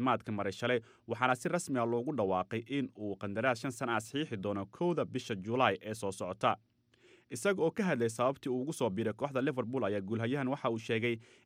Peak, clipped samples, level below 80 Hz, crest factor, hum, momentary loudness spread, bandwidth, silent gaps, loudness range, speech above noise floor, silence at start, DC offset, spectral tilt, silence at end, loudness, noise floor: -14 dBFS; under 0.1%; -76 dBFS; 20 dB; none; 7 LU; 16 kHz; none; 1 LU; 31 dB; 0 s; under 0.1%; -5.5 dB/octave; 0.2 s; -34 LUFS; -65 dBFS